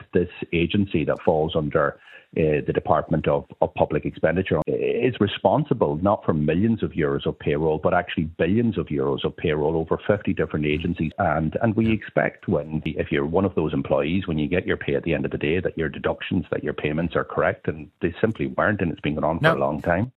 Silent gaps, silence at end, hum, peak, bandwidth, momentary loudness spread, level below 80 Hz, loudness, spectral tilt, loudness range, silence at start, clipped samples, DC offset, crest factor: none; 0.1 s; none; -2 dBFS; 4.8 kHz; 5 LU; -44 dBFS; -23 LUFS; -9.5 dB/octave; 3 LU; 0 s; under 0.1%; under 0.1%; 20 dB